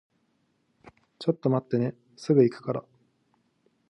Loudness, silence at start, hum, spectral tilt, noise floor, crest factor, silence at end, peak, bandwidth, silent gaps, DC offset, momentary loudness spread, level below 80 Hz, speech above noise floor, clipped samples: -27 LUFS; 1.2 s; none; -8.5 dB/octave; -71 dBFS; 22 dB; 1.1 s; -8 dBFS; 11 kHz; none; under 0.1%; 12 LU; -74 dBFS; 46 dB; under 0.1%